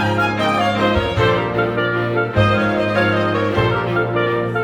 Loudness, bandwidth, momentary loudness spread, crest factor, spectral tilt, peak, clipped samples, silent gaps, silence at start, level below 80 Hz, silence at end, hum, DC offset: -17 LUFS; 12 kHz; 3 LU; 14 dB; -7 dB/octave; -2 dBFS; under 0.1%; none; 0 s; -38 dBFS; 0 s; none; under 0.1%